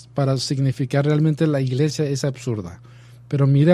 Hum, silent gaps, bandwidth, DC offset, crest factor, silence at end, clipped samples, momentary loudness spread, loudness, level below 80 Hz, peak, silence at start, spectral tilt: none; none; 11.5 kHz; under 0.1%; 18 dB; 0 s; under 0.1%; 9 LU; -21 LUFS; -56 dBFS; -2 dBFS; 0.15 s; -7 dB/octave